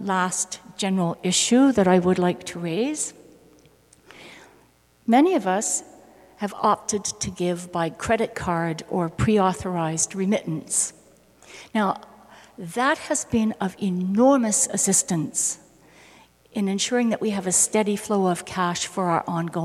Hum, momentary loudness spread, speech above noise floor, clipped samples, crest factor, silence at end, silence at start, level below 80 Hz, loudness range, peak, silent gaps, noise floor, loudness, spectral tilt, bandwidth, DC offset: none; 10 LU; 35 dB; under 0.1%; 18 dB; 0 s; 0 s; -54 dBFS; 4 LU; -6 dBFS; none; -58 dBFS; -23 LUFS; -4 dB/octave; 14.5 kHz; under 0.1%